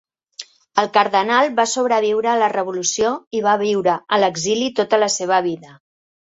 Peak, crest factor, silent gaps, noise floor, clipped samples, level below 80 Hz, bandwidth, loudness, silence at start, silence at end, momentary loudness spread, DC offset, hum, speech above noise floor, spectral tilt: -2 dBFS; 18 dB; 3.27-3.31 s; -40 dBFS; under 0.1%; -62 dBFS; 8 kHz; -18 LUFS; 0.4 s; 0.6 s; 8 LU; under 0.1%; none; 22 dB; -2.5 dB/octave